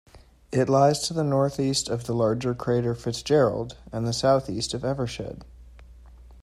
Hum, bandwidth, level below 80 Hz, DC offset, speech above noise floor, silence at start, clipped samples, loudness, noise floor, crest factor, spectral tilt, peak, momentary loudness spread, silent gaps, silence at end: none; 14 kHz; -50 dBFS; under 0.1%; 23 dB; 0.15 s; under 0.1%; -25 LUFS; -47 dBFS; 18 dB; -5.5 dB/octave; -6 dBFS; 10 LU; none; 0 s